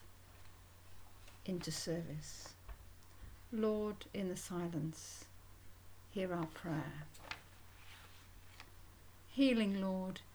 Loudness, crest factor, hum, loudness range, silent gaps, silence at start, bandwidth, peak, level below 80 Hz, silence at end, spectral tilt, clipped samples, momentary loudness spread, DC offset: -41 LUFS; 20 dB; none; 6 LU; none; 0 s; over 20 kHz; -22 dBFS; -62 dBFS; 0 s; -5.5 dB/octave; under 0.1%; 23 LU; under 0.1%